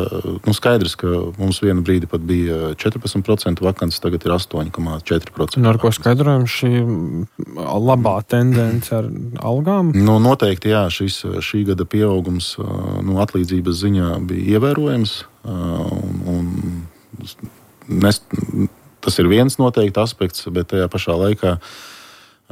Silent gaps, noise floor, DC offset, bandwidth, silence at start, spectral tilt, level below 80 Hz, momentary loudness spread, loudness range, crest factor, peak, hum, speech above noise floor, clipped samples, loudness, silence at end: none; -45 dBFS; under 0.1%; 16 kHz; 0 s; -6.5 dB/octave; -40 dBFS; 10 LU; 4 LU; 14 dB; -2 dBFS; none; 28 dB; under 0.1%; -18 LUFS; 0.5 s